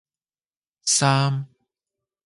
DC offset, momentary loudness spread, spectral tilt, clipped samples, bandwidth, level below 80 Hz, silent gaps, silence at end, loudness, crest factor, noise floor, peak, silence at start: under 0.1%; 14 LU; -3.5 dB/octave; under 0.1%; 11.5 kHz; -66 dBFS; none; 0.8 s; -21 LUFS; 18 dB; under -90 dBFS; -6 dBFS; 0.85 s